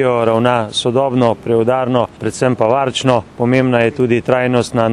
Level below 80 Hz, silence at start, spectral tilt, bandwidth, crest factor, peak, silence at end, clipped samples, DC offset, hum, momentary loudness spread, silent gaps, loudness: -50 dBFS; 0 s; -6 dB/octave; 12 kHz; 14 dB; 0 dBFS; 0 s; under 0.1%; under 0.1%; none; 3 LU; none; -14 LUFS